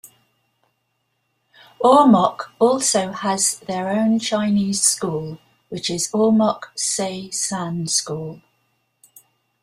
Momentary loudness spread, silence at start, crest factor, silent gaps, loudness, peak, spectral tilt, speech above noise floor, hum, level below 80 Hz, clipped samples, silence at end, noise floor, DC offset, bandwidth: 12 LU; 1.8 s; 18 dB; none; -19 LUFS; -2 dBFS; -4 dB/octave; 52 dB; none; -62 dBFS; under 0.1%; 1.25 s; -71 dBFS; under 0.1%; 15 kHz